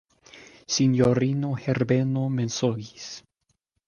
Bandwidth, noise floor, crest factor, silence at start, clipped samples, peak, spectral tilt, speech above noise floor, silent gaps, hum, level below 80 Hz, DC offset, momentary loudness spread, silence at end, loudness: 7.2 kHz; -75 dBFS; 18 dB; 0.35 s; under 0.1%; -8 dBFS; -6 dB/octave; 51 dB; none; none; -58 dBFS; under 0.1%; 18 LU; 0.7 s; -24 LUFS